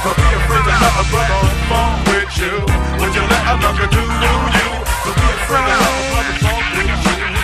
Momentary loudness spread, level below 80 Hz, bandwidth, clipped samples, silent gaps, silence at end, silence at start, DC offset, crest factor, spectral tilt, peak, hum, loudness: 4 LU; -20 dBFS; 14 kHz; under 0.1%; none; 0 s; 0 s; under 0.1%; 14 dB; -4.5 dB/octave; 0 dBFS; none; -14 LUFS